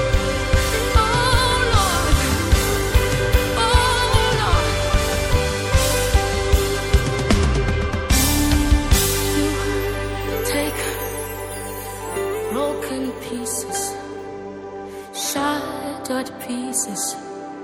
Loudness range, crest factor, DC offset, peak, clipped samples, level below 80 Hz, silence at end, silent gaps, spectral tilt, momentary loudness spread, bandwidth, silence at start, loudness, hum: 8 LU; 16 dB; under 0.1%; -2 dBFS; under 0.1%; -24 dBFS; 0 s; none; -4 dB/octave; 12 LU; 17 kHz; 0 s; -20 LUFS; none